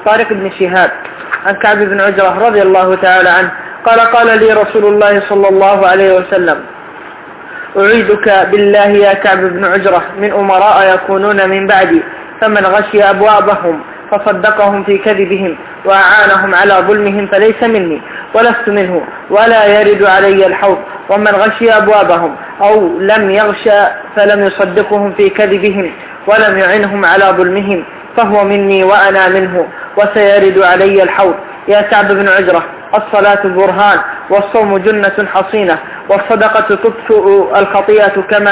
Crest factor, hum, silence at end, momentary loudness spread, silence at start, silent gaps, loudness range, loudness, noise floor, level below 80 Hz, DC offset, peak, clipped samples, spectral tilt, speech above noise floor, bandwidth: 8 dB; none; 0 s; 8 LU; 0 s; none; 2 LU; -8 LUFS; -28 dBFS; -48 dBFS; under 0.1%; 0 dBFS; 1%; -8.5 dB/octave; 20 dB; 4 kHz